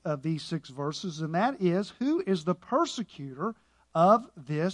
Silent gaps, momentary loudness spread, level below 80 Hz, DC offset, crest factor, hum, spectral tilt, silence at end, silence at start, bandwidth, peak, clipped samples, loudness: none; 12 LU; -70 dBFS; under 0.1%; 20 dB; none; -6.5 dB/octave; 0 s; 0.05 s; 11 kHz; -8 dBFS; under 0.1%; -29 LUFS